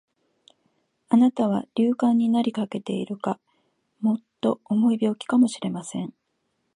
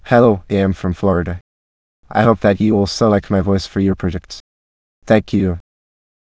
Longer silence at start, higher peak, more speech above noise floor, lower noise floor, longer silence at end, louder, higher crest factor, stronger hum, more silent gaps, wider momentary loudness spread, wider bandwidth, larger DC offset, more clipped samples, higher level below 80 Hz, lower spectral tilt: first, 1.1 s vs 0.05 s; second, -6 dBFS vs 0 dBFS; second, 51 dB vs over 75 dB; second, -74 dBFS vs under -90 dBFS; about the same, 0.65 s vs 0.6 s; second, -24 LUFS vs -16 LUFS; about the same, 18 dB vs 16 dB; neither; second, none vs 1.41-2.03 s, 4.40-5.02 s; second, 11 LU vs 14 LU; first, 10.5 kHz vs 8 kHz; second, under 0.1% vs 0.1%; neither; second, -74 dBFS vs -34 dBFS; about the same, -6.5 dB/octave vs -7 dB/octave